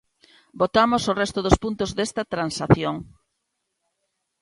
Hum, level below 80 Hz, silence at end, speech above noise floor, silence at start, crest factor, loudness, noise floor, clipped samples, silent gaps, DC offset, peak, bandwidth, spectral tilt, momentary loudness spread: none; -40 dBFS; 1.35 s; 56 dB; 0.55 s; 22 dB; -22 LUFS; -78 dBFS; under 0.1%; none; under 0.1%; -2 dBFS; 11.5 kHz; -5.5 dB/octave; 7 LU